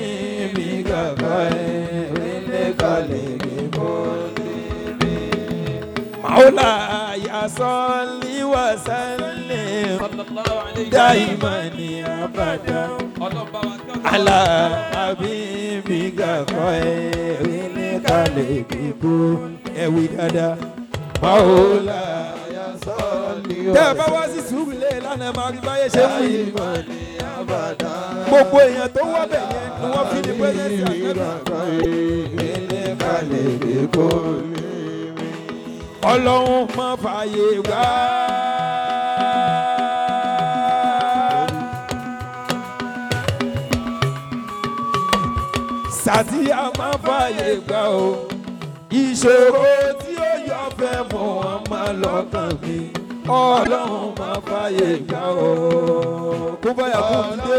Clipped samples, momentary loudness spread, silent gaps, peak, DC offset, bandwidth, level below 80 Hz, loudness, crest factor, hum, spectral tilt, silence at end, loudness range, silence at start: under 0.1%; 12 LU; none; -4 dBFS; under 0.1%; 19.5 kHz; -44 dBFS; -20 LUFS; 16 dB; none; -5.5 dB/octave; 0 s; 4 LU; 0 s